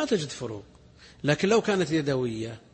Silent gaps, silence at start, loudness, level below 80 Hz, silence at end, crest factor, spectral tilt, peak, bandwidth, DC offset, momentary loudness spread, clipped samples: none; 0 s; -27 LUFS; -58 dBFS; 0.15 s; 16 dB; -5.5 dB/octave; -12 dBFS; 8.8 kHz; under 0.1%; 13 LU; under 0.1%